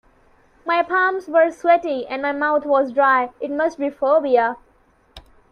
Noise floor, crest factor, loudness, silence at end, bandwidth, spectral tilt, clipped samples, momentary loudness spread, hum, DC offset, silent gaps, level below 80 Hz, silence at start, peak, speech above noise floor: -57 dBFS; 16 dB; -19 LUFS; 0.3 s; 9.2 kHz; -4.5 dB/octave; under 0.1%; 8 LU; none; under 0.1%; none; -58 dBFS; 0.65 s; -4 dBFS; 39 dB